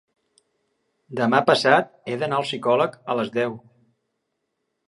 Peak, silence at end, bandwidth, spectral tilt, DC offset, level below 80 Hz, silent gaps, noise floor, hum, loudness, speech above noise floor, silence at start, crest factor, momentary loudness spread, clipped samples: 0 dBFS; 1.3 s; 11.5 kHz; -5 dB/octave; under 0.1%; -72 dBFS; none; -77 dBFS; none; -21 LUFS; 56 dB; 1.1 s; 24 dB; 12 LU; under 0.1%